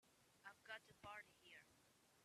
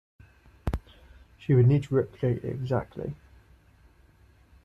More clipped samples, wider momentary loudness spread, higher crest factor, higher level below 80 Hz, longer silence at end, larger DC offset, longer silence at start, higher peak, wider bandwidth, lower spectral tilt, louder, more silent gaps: neither; second, 8 LU vs 17 LU; about the same, 22 dB vs 18 dB; second, -90 dBFS vs -46 dBFS; second, 0 s vs 1.5 s; neither; second, 0 s vs 0.65 s; second, -40 dBFS vs -10 dBFS; first, 14 kHz vs 7.8 kHz; second, -2.5 dB/octave vs -9.5 dB/octave; second, -61 LUFS vs -28 LUFS; neither